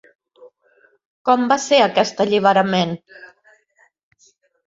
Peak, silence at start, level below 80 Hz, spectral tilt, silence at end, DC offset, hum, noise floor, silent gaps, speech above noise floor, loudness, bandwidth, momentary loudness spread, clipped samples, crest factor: -2 dBFS; 0.45 s; -64 dBFS; -4.5 dB/octave; 1.45 s; under 0.1%; none; -60 dBFS; 1.06-1.25 s; 43 dB; -17 LUFS; 7.8 kHz; 10 LU; under 0.1%; 18 dB